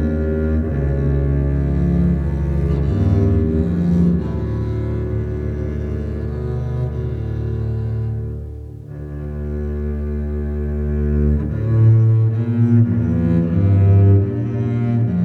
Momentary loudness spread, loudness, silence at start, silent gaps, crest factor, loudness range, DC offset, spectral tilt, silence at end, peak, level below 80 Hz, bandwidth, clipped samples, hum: 10 LU; -19 LUFS; 0 s; none; 14 dB; 9 LU; under 0.1%; -11 dB/octave; 0 s; -4 dBFS; -24 dBFS; 4.2 kHz; under 0.1%; none